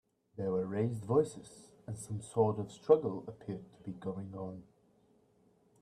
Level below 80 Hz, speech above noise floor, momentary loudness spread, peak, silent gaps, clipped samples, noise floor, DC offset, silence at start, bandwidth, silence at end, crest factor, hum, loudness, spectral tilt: -72 dBFS; 35 dB; 20 LU; -12 dBFS; none; under 0.1%; -69 dBFS; under 0.1%; 0.35 s; 12.5 kHz; 1.2 s; 24 dB; none; -35 LUFS; -7.5 dB/octave